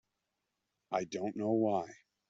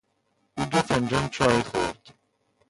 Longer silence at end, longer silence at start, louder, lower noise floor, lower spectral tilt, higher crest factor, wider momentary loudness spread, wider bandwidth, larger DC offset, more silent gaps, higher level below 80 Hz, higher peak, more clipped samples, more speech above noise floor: second, 0.35 s vs 0.6 s; first, 0.9 s vs 0.55 s; second, -35 LUFS vs -25 LUFS; first, -86 dBFS vs -71 dBFS; first, -6.5 dB/octave vs -5 dB/octave; about the same, 20 dB vs 20 dB; second, 7 LU vs 13 LU; second, 7.6 kHz vs 11.5 kHz; neither; neither; second, -80 dBFS vs -50 dBFS; second, -18 dBFS vs -6 dBFS; neither; first, 52 dB vs 46 dB